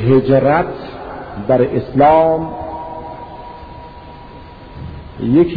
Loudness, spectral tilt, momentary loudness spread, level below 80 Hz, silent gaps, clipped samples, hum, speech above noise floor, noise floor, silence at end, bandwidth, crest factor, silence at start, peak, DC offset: -14 LUFS; -11 dB/octave; 24 LU; -38 dBFS; none; under 0.1%; none; 23 dB; -35 dBFS; 0 s; 5 kHz; 16 dB; 0 s; 0 dBFS; under 0.1%